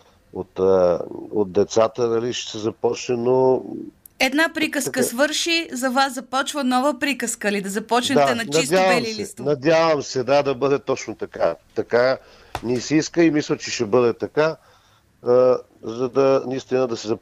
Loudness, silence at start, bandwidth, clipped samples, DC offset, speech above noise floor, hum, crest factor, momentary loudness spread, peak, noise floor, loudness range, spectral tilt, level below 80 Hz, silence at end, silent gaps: -20 LUFS; 0.35 s; 15.5 kHz; under 0.1%; under 0.1%; 36 dB; none; 16 dB; 10 LU; -4 dBFS; -56 dBFS; 2 LU; -4 dB/octave; -58 dBFS; 0.05 s; none